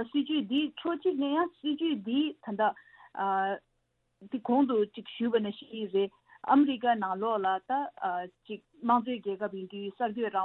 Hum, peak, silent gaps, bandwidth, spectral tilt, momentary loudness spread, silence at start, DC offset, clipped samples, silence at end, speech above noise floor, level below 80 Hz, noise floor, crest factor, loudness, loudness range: none; -10 dBFS; none; 4.2 kHz; -8.5 dB/octave; 12 LU; 0 s; under 0.1%; under 0.1%; 0 s; 47 dB; -76 dBFS; -77 dBFS; 20 dB; -31 LUFS; 3 LU